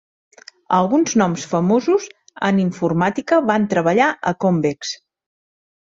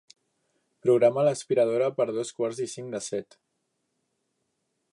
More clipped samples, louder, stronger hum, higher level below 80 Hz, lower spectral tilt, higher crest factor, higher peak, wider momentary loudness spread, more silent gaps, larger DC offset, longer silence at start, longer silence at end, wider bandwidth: neither; first, -18 LUFS vs -26 LUFS; neither; first, -60 dBFS vs -78 dBFS; about the same, -5.5 dB/octave vs -5.5 dB/octave; about the same, 16 dB vs 20 dB; first, -2 dBFS vs -8 dBFS; second, 7 LU vs 13 LU; neither; neither; second, 0.7 s vs 0.85 s; second, 0.9 s vs 1.7 s; second, 7.8 kHz vs 11.5 kHz